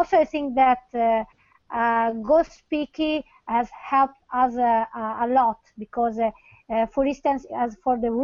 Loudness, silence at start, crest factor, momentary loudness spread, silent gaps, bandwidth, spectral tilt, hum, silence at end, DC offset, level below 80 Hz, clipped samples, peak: -23 LUFS; 0 s; 16 dB; 8 LU; none; 7.2 kHz; -6 dB/octave; none; 0 s; under 0.1%; -54 dBFS; under 0.1%; -8 dBFS